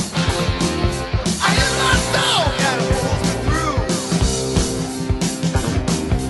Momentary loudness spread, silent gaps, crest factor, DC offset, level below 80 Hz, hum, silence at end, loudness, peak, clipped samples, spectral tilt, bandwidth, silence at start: 6 LU; none; 14 dB; under 0.1%; -28 dBFS; none; 0 s; -18 LUFS; -4 dBFS; under 0.1%; -4 dB/octave; 12.5 kHz; 0 s